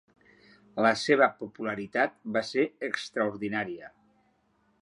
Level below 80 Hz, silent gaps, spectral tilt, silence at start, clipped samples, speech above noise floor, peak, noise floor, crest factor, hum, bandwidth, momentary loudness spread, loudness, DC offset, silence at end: -72 dBFS; none; -4.5 dB/octave; 0.75 s; under 0.1%; 41 dB; -8 dBFS; -69 dBFS; 22 dB; none; 11.5 kHz; 12 LU; -28 LUFS; under 0.1%; 0.95 s